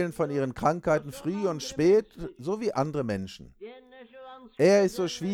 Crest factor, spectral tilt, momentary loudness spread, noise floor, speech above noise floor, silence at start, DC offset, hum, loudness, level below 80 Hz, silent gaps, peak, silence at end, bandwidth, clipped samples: 16 dB; -6 dB/octave; 23 LU; -49 dBFS; 22 dB; 0 s; under 0.1%; none; -27 LUFS; -56 dBFS; none; -10 dBFS; 0 s; 16 kHz; under 0.1%